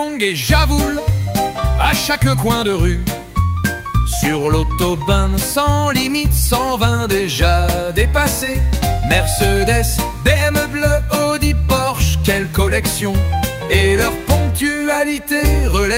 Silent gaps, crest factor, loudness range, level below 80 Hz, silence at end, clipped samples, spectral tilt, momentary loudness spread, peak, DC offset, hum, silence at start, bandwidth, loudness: none; 14 dB; 1 LU; -20 dBFS; 0 s; under 0.1%; -4.5 dB/octave; 4 LU; -2 dBFS; 0.1%; none; 0 s; 16.5 kHz; -16 LUFS